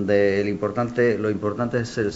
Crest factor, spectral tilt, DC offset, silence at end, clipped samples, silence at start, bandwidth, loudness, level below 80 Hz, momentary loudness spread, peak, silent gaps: 16 dB; -7 dB/octave; 0.1%; 0 s; under 0.1%; 0 s; 8 kHz; -23 LUFS; -54 dBFS; 5 LU; -6 dBFS; none